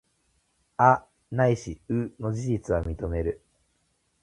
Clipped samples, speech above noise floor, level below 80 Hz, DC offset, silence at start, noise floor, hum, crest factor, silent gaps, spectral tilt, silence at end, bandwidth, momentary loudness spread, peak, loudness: under 0.1%; 46 dB; -42 dBFS; under 0.1%; 0.8 s; -71 dBFS; none; 24 dB; none; -7.5 dB/octave; 0.9 s; 11 kHz; 12 LU; -4 dBFS; -26 LUFS